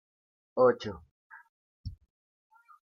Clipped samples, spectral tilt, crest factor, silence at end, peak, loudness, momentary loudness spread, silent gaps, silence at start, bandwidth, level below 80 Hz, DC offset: under 0.1%; -7 dB/octave; 22 dB; 0.95 s; -12 dBFS; -28 LUFS; 22 LU; 1.11-1.30 s, 1.49-1.84 s; 0.55 s; 6.6 kHz; -58 dBFS; under 0.1%